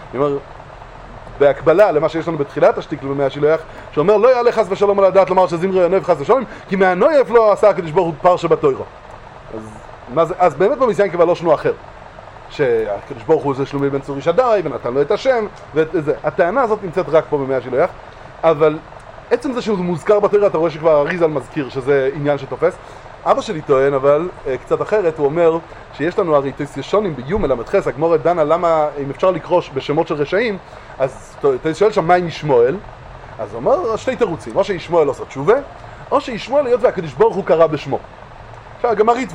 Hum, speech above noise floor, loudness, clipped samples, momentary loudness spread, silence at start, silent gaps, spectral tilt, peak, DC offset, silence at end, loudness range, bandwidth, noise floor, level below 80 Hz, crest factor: none; 21 dB; -16 LUFS; under 0.1%; 15 LU; 0 s; none; -6.5 dB/octave; 0 dBFS; under 0.1%; 0 s; 4 LU; 10.5 kHz; -36 dBFS; -44 dBFS; 16 dB